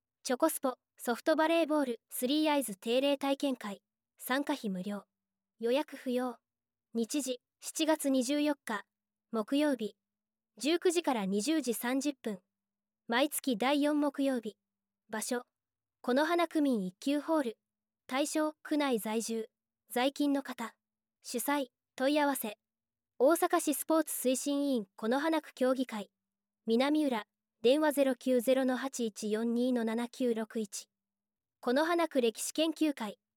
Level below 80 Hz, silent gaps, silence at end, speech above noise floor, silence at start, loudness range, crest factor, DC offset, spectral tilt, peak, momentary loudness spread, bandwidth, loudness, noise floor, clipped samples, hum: -88 dBFS; none; 0.2 s; over 58 dB; 0.25 s; 4 LU; 18 dB; under 0.1%; -3.5 dB/octave; -14 dBFS; 11 LU; 17.5 kHz; -32 LUFS; under -90 dBFS; under 0.1%; none